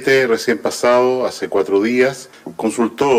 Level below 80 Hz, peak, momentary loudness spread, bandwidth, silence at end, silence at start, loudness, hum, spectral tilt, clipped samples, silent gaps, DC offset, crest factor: -60 dBFS; -4 dBFS; 8 LU; 15.5 kHz; 0 s; 0 s; -16 LUFS; none; -4 dB/octave; under 0.1%; none; under 0.1%; 12 dB